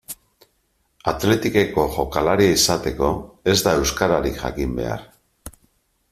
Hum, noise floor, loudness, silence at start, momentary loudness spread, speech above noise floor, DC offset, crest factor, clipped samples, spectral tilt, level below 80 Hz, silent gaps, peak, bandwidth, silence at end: none; -67 dBFS; -20 LUFS; 0.1 s; 11 LU; 47 dB; under 0.1%; 20 dB; under 0.1%; -4 dB/octave; -38 dBFS; none; -2 dBFS; 16 kHz; 0.6 s